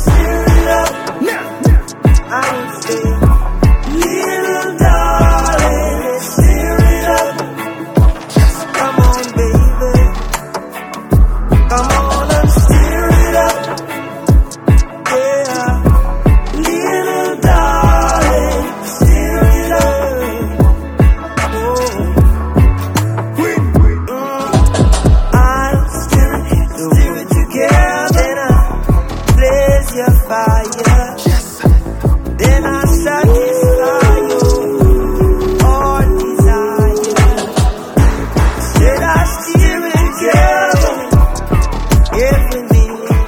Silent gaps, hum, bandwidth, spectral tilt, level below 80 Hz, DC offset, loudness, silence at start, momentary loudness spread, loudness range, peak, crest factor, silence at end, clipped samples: none; none; 17.5 kHz; -6 dB/octave; -14 dBFS; under 0.1%; -12 LUFS; 0 s; 6 LU; 2 LU; 0 dBFS; 10 dB; 0 s; under 0.1%